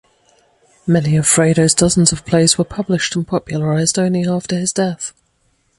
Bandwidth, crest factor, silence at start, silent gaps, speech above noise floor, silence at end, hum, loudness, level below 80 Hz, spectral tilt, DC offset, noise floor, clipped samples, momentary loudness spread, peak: 11.5 kHz; 16 dB; 0.85 s; none; 46 dB; 0.7 s; none; -15 LUFS; -44 dBFS; -4.5 dB/octave; under 0.1%; -61 dBFS; under 0.1%; 8 LU; 0 dBFS